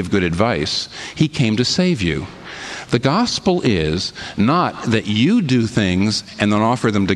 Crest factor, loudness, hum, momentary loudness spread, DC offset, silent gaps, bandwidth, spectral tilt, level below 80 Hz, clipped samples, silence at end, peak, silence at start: 16 dB; -18 LUFS; none; 7 LU; under 0.1%; none; 11.5 kHz; -5.5 dB/octave; -42 dBFS; under 0.1%; 0 s; -2 dBFS; 0 s